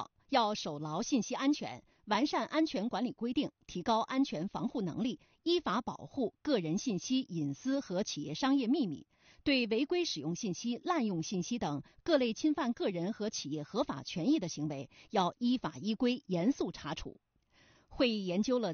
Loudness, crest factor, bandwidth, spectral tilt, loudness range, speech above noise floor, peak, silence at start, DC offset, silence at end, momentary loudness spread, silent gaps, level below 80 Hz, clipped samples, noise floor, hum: -34 LUFS; 20 dB; 6.8 kHz; -4.5 dB/octave; 1 LU; 34 dB; -14 dBFS; 0 s; under 0.1%; 0 s; 7 LU; none; -66 dBFS; under 0.1%; -68 dBFS; none